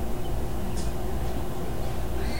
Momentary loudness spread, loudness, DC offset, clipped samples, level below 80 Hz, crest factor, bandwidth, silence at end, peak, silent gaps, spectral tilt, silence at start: 1 LU; -33 LUFS; 4%; under 0.1%; -32 dBFS; 12 dB; 16 kHz; 0 s; -16 dBFS; none; -6 dB/octave; 0 s